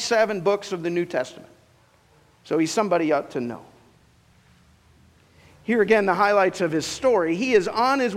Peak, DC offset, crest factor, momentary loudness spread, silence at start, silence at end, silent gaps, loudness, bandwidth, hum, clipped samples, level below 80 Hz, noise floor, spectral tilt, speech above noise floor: -4 dBFS; under 0.1%; 20 dB; 11 LU; 0 s; 0 s; none; -22 LUFS; 15 kHz; none; under 0.1%; -62 dBFS; -58 dBFS; -4.5 dB/octave; 36 dB